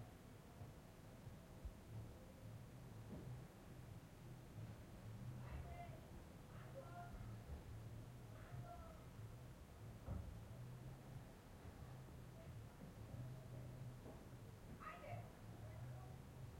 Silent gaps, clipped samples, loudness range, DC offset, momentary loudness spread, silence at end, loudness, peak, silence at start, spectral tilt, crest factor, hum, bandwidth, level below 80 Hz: none; under 0.1%; 2 LU; under 0.1%; 6 LU; 0 s; -57 LUFS; -38 dBFS; 0 s; -6.5 dB/octave; 18 dB; none; 16 kHz; -64 dBFS